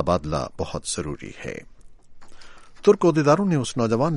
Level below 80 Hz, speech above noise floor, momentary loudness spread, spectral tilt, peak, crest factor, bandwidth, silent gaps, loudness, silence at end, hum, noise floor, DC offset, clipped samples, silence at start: -46 dBFS; 20 dB; 16 LU; -6 dB/octave; -4 dBFS; 18 dB; 11.5 kHz; none; -22 LUFS; 0 s; none; -42 dBFS; under 0.1%; under 0.1%; 0 s